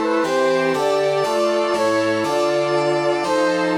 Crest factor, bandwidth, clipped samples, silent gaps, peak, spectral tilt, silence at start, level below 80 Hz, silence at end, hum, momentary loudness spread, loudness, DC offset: 10 dB; 17 kHz; under 0.1%; none; -8 dBFS; -4.5 dB/octave; 0 s; -60 dBFS; 0 s; none; 1 LU; -19 LUFS; under 0.1%